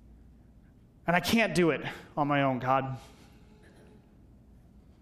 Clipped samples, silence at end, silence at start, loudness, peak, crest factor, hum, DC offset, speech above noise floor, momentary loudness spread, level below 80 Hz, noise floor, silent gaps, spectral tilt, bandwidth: under 0.1%; 1.95 s; 1.05 s; -28 LUFS; -10 dBFS; 22 dB; none; under 0.1%; 29 dB; 12 LU; -58 dBFS; -57 dBFS; none; -5.5 dB/octave; 15 kHz